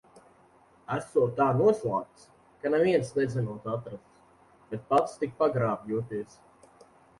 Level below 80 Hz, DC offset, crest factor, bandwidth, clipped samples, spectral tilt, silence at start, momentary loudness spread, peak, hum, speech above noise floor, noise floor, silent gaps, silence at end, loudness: -64 dBFS; under 0.1%; 18 dB; 11.5 kHz; under 0.1%; -7.5 dB/octave; 0.15 s; 16 LU; -12 dBFS; none; 32 dB; -60 dBFS; none; 0.95 s; -28 LUFS